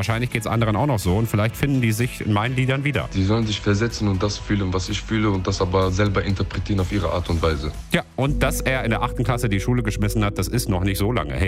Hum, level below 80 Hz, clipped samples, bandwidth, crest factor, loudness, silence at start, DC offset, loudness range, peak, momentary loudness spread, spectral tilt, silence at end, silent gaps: none; -32 dBFS; under 0.1%; 16 kHz; 16 dB; -22 LUFS; 0 s; under 0.1%; 1 LU; -4 dBFS; 3 LU; -6 dB/octave; 0 s; none